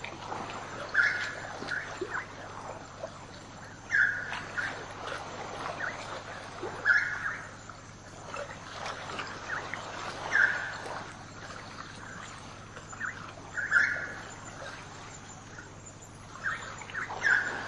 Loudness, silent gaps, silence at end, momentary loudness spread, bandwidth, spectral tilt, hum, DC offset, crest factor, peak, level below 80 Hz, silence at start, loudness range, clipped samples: -33 LUFS; none; 0 s; 20 LU; 11.5 kHz; -3 dB/octave; none; under 0.1%; 24 dB; -10 dBFS; -60 dBFS; 0 s; 2 LU; under 0.1%